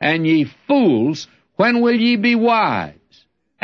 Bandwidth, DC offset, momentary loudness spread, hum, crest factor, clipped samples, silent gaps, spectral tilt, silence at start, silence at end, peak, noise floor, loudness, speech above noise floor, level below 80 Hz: 7.2 kHz; under 0.1%; 11 LU; none; 14 dB; under 0.1%; none; -6.5 dB/octave; 0 s; 0.75 s; -4 dBFS; -56 dBFS; -16 LUFS; 41 dB; -62 dBFS